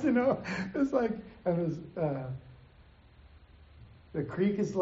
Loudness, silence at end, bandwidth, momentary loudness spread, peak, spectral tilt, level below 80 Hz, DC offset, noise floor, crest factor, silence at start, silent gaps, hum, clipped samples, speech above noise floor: -32 LUFS; 0 s; 7.6 kHz; 10 LU; -16 dBFS; -7 dB/octave; -60 dBFS; under 0.1%; -58 dBFS; 18 dB; 0 s; none; none; under 0.1%; 27 dB